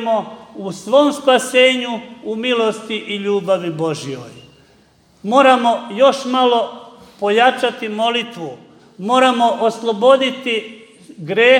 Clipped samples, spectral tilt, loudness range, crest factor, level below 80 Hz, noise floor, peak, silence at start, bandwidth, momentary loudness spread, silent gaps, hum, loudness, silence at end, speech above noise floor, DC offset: under 0.1%; -4 dB/octave; 3 LU; 16 dB; -66 dBFS; -52 dBFS; 0 dBFS; 0 s; 13.5 kHz; 16 LU; none; none; -16 LUFS; 0 s; 37 dB; under 0.1%